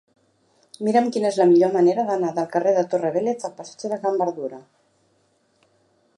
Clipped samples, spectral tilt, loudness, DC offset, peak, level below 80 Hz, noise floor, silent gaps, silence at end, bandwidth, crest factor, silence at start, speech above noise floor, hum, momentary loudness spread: under 0.1%; -6.5 dB/octave; -21 LUFS; under 0.1%; -6 dBFS; -76 dBFS; -64 dBFS; none; 1.55 s; 11 kHz; 16 dB; 0.8 s; 44 dB; none; 14 LU